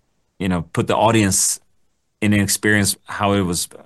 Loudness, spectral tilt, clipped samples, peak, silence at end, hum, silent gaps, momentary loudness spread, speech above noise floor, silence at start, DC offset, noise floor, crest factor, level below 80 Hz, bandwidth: -18 LUFS; -4 dB/octave; under 0.1%; -4 dBFS; 0.2 s; none; none; 8 LU; 48 dB; 0.4 s; under 0.1%; -66 dBFS; 16 dB; -50 dBFS; 13 kHz